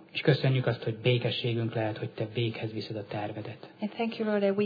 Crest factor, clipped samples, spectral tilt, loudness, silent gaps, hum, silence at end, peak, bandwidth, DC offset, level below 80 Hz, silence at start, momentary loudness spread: 20 dB; under 0.1%; -8.5 dB/octave; -30 LUFS; none; none; 0 s; -10 dBFS; 5 kHz; under 0.1%; -70 dBFS; 0 s; 11 LU